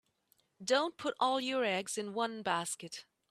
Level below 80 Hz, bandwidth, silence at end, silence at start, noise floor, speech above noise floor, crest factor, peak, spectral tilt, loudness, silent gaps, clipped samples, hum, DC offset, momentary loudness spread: -82 dBFS; 15 kHz; 0.3 s; 0.6 s; -75 dBFS; 40 dB; 20 dB; -16 dBFS; -2.5 dB/octave; -34 LUFS; none; under 0.1%; none; under 0.1%; 11 LU